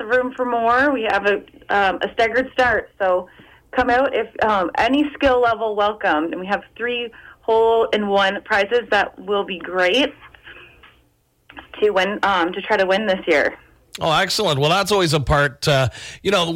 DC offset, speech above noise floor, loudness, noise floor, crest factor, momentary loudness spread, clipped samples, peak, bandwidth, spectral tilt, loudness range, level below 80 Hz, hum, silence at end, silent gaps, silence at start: under 0.1%; 42 dB; -19 LUFS; -61 dBFS; 12 dB; 7 LU; under 0.1%; -8 dBFS; 16.5 kHz; -4.5 dB/octave; 3 LU; -44 dBFS; none; 0 s; none; 0 s